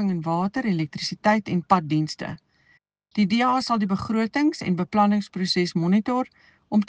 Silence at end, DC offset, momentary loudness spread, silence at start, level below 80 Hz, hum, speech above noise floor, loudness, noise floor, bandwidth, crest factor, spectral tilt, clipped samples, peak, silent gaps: 0.05 s; under 0.1%; 8 LU; 0 s; -60 dBFS; none; 40 dB; -23 LUFS; -63 dBFS; 9.2 kHz; 20 dB; -6 dB/octave; under 0.1%; -4 dBFS; none